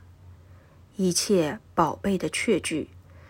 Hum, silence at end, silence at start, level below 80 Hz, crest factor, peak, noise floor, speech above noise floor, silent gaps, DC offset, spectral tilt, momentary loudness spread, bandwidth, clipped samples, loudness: none; 0.1 s; 0.25 s; -58 dBFS; 20 dB; -8 dBFS; -52 dBFS; 27 dB; none; under 0.1%; -4 dB/octave; 10 LU; 16.5 kHz; under 0.1%; -25 LUFS